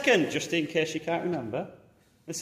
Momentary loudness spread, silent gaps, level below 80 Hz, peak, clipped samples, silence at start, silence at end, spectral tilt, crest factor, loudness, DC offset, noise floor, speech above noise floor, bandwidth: 12 LU; none; -68 dBFS; -8 dBFS; under 0.1%; 0 s; 0 s; -4 dB/octave; 20 dB; -29 LUFS; under 0.1%; -50 dBFS; 22 dB; 15.5 kHz